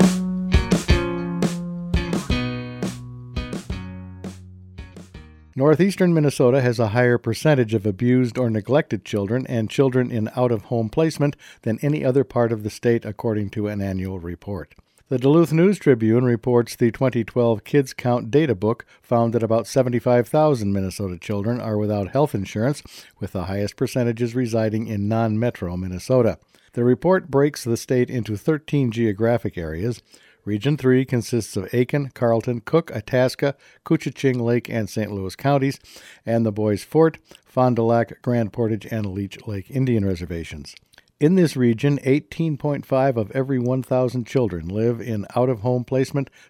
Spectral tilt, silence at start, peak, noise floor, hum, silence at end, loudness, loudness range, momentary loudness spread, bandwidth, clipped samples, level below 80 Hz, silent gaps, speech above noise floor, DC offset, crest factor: -7 dB/octave; 0 s; -2 dBFS; -43 dBFS; none; 0.25 s; -21 LUFS; 5 LU; 12 LU; 16 kHz; under 0.1%; -38 dBFS; none; 23 dB; under 0.1%; 20 dB